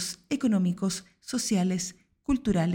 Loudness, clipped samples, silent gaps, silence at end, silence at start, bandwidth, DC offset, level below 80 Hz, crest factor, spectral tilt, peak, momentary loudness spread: -28 LUFS; under 0.1%; none; 0 s; 0 s; 17 kHz; under 0.1%; -50 dBFS; 14 dB; -5 dB/octave; -14 dBFS; 10 LU